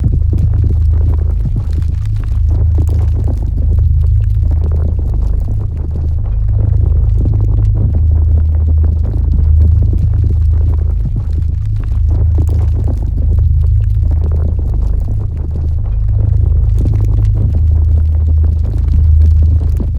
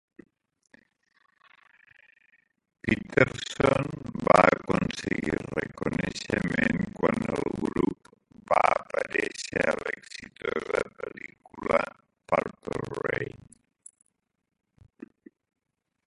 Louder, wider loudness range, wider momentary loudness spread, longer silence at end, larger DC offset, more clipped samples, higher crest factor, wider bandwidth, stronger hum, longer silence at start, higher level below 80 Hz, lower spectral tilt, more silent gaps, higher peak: first, -13 LUFS vs -28 LUFS; second, 2 LU vs 9 LU; second, 5 LU vs 13 LU; second, 0 s vs 2.7 s; neither; neither; second, 10 dB vs 28 dB; second, 1.7 kHz vs 11.5 kHz; neither; second, 0 s vs 2.85 s; first, -12 dBFS vs -54 dBFS; first, -10.5 dB/octave vs -5.5 dB/octave; neither; about the same, 0 dBFS vs -2 dBFS